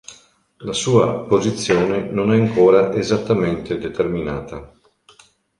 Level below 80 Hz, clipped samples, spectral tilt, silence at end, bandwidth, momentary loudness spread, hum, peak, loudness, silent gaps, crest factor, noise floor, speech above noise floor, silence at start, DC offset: -46 dBFS; under 0.1%; -6 dB/octave; 0.95 s; 11 kHz; 13 LU; none; -2 dBFS; -18 LUFS; none; 16 dB; -52 dBFS; 35 dB; 0.1 s; under 0.1%